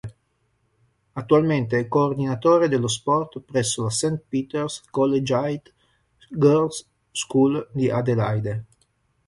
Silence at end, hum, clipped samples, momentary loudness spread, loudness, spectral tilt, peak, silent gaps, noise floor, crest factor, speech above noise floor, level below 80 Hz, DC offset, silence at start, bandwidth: 0.65 s; none; under 0.1%; 13 LU; -22 LUFS; -5.5 dB/octave; -4 dBFS; none; -69 dBFS; 18 dB; 47 dB; -56 dBFS; under 0.1%; 0.05 s; 11.5 kHz